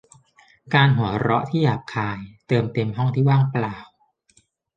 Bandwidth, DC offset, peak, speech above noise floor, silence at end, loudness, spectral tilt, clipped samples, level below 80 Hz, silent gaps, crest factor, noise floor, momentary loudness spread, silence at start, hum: 7.8 kHz; under 0.1%; -2 dBFS; 41 dB; 0.9 s; -21 LUFS; -8 dB/octave; under 0.1%; -54 dBFS; none; 20 dB; -62 dBFS; 11 LU; 0.65 s; none